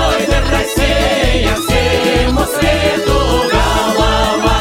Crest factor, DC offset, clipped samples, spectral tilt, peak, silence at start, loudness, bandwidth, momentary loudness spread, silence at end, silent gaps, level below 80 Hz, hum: 12 dB; under 0.1%; under 0.1%; -4.5 dB/octave; 0 dBFS; 0 s; -13 LUFS; 16.5 kHz; 1 LU; 0 s; none; -18 dBFS; none